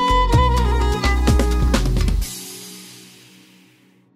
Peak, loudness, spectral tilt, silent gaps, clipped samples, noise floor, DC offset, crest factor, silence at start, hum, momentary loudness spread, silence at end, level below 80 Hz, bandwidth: -2 dBFS; -19 LUFS; -5.5 dB/octave; none; under 0.1%; -54 dBFS; under 0.1%; 16 dB; 0 s; none; 18 LU; 1.2 s; -20 dBFS; 15.5 kHz